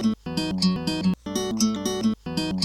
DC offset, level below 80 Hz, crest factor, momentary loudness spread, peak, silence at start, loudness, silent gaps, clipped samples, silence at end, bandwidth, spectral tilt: under 0.1%; -48 dBFS; 16 dB; 4 LU; -10 dBFS; 0 s; -25 LUFS; none; under 0.1%; 0 s; 15 kHz; -5 dB/octave